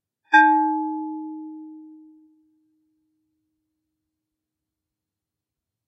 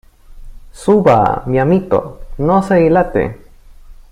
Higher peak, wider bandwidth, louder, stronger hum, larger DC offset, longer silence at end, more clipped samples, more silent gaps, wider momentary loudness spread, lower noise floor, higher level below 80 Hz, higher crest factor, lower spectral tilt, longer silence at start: about the same, -2 dBFS vs 0 dBFS; second, 7.4 kHz vs 11.5 kHz; second, -19 LUFS vs -13 LUFS; neither; neither; first, 4 s vs 0.2 s; neither; neither; first, 24 LU vs 10 LU; first, -87 dBFS vs -37 dBFS; second, under -90 dBFS vs -34 dBFS; first, 24 dB vs 14 dB; second, 2 dB/octave vs -8 dB/octave; about the same, 0.3 s vs 0.3 s